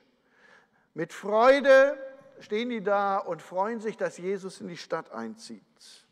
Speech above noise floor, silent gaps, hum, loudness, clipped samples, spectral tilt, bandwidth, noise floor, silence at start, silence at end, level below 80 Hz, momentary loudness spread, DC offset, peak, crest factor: 36 dB; none; none; -26 LUFS; under 0.1%; -4.5 dB/octave; 10.5 kHz; -62 dBFS; 0.95 s; 0.55 s; -72 dBFS; 21 LU; under 0.1%; -8 dBFS; 18 dB